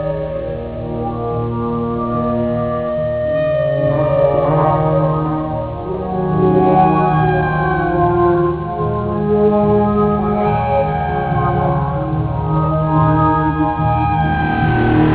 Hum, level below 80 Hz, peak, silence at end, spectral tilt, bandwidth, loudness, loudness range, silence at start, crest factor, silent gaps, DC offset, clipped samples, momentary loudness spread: none; -30 dBFS; -2 dBFS; 0 s; -12 dB/octave; 4 kHz; -16 LUFS; 3 LU; 0 s; 14 dB; none; 0.4%; under 0.1%; 8 LU